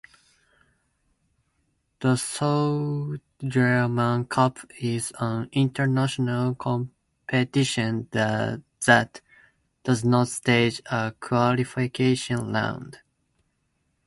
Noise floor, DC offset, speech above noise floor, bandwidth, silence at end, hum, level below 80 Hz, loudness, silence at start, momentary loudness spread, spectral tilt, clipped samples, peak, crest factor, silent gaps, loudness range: -73 dBFS; under 0.1%; 49 dB; 11.5 kHz; 1.1 s; none; -60 dBFS; -24 LUFS; 2 s; 9 LU; -5.5 dB/octave; under 0.1%; -2 dBFS; 24 dB; none; 3 LU